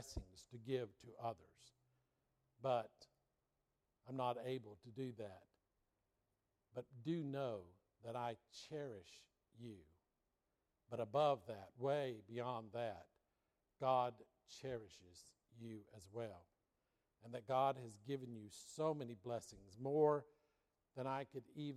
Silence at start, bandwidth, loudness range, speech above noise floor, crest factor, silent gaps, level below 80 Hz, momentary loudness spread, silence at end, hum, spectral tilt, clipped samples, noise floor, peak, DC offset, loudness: 0 s; 14 kHz; 7 LU; 44 dB; 22 dB; none; -72 dBFS; 20 LU; 0 s; none; -6 dB/octave; under 0.1%; -88 dBFS; -24 dBFS; under 0.1%; -45 LUFS